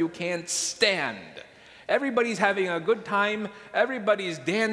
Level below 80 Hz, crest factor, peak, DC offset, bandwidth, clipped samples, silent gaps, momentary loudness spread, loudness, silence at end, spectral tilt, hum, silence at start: -70 dBFS; 20 dB; -6 dBFS; under 0.1%; 11 kHz; under 0.1%; none; 10 LU; -26 LUFS; 0 s; -3 dB/octave; none; 0 s